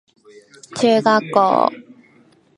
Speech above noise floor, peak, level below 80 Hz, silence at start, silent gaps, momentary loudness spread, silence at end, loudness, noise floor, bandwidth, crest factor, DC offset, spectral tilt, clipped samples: 38 dB; 0 dBFS; -68 dBFS; 0.7 s; none; 7 LU; 0.75 s; -16 LUFS; -53 dBFS; 11.5 kHz; 18 dB; under 0.1%; -5 dB/octave; under 0.1%